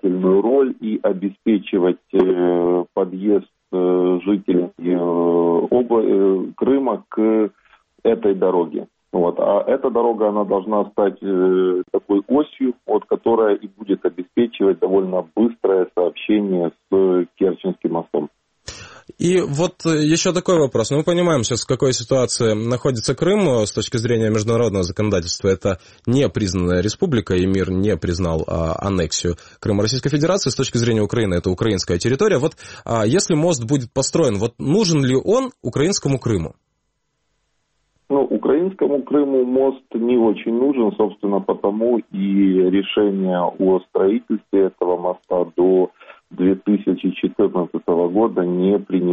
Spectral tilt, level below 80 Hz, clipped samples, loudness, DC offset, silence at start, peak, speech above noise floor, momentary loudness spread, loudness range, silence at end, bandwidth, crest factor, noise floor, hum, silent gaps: -6 dB/octave; -46 dBFS; under 0.1%; -19 LUFS; under 0.1%; 0.05 s; -2 dBFS; 53 dB; 6 LU; 2 LU; 0 s; 8.8 kHz; 16 dB; -71 dBFS; none; none